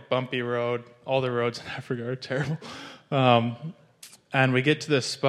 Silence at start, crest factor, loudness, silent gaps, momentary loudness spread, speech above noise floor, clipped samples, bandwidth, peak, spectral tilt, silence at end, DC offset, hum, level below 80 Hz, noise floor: 0 s; 20 dB; -26 LUFS; none; 14 LU; 26 dB; under 0.1%; 12.5 kHz; -6 dBFS; -5.5 dB/octave; 0 s; under 0.1%; none; -68 dBFS; -52 dBFS